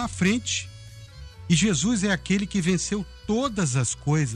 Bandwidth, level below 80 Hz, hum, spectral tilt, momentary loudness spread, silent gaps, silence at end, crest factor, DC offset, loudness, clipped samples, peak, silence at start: 11.5 kHz; -46 dBFS; none; -4.5 dB/octave; 21 LU; none; 0 s; 16 dB; under 0.1%; -24 LUFS; under 0.1%; -8 dBFS; 0 s